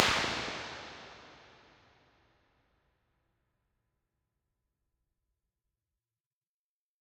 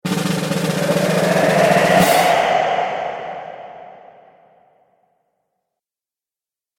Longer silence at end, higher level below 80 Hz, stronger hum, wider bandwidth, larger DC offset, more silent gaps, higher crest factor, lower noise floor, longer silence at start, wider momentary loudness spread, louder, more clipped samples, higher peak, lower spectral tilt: first, 5.6 s vs 2.9 s; second, -64 dBFS vs -54 dBFS; neither; about the same, 16 kHz vs 17 kHz; neither; neither; first, 40 dB vs 18 dB; about the same, under -90 dBFS vs -90 dBFS; about the same, 0 s vs 0.05 s; first, 25 LU vs 18 LU; second, -34 LUFS vs -16 LUFS; neither; about the same, -2 dBFS vs -2 dBFS; second, -2 dB/octave vs -4.5 dB/octave